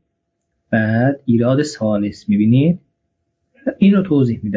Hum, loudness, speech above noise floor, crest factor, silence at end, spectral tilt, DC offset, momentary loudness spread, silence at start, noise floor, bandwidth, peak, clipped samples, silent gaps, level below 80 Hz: none; -16 LUFS; 58 dB; 14 dB; 0 s; -8 dB/octave; under 0.1%; 7 LU; 0.7 s; -73 dBFS; 7.8 kHz; -2 dBFS; under 0.1%; none; -50 dBFS